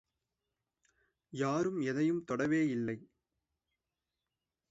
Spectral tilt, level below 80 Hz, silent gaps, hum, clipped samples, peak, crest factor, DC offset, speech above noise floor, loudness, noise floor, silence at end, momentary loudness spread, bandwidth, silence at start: -6.5 dB/octave; -76 dBFS; none; none; under 0.1%; -20 dBFS; 16 dB; under 0.1%; 57 dB; -34 LUFS; -90 dBFS; 1.65 s; 9 LU; 8 kHz; 1.35 s